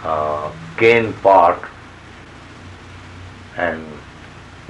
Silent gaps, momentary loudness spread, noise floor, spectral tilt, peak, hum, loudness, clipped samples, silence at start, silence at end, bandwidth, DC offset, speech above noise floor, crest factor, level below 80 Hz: none; 26 LU; -39 dBFS; -6 dB/octave; -2 dBFS; none; -16 LUFS; under 0.1%; 0 s; 0.1 s; 11 kHz; under 0.1%; 24 dB; 18 dB; -48 dBFS